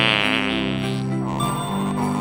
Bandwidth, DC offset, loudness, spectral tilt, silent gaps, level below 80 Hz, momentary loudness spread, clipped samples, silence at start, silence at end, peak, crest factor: 16.5 kHz; under 0.1%; -22 LUFS; -5 dB/octave; none; -46 dBFS; 6 LU; under 0.1%; 0 s; 0 s; -2 dBFS; 20 dB